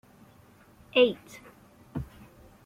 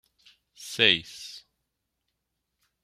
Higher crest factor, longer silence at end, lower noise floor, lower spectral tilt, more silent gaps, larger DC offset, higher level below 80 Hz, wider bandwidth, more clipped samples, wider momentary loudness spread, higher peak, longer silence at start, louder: second, 22 dB vs 28 dB; second, 0.6 s vs 1.45 s; second, -57 dBFS vs -81 dBFS; first, -5.5 dB/octave vs -2 dB/octave; neither; neither; first, -56 dBFS vs -70 dBFS; about the same, 15 kHz vs 15.5 kHz; neither; first, 25 LU vs 22 LU; second, -10 dBFS vs -4 dBFS; first, 0.95 s vs 0.6 s; second, -27 LUFS vs -22 LUFS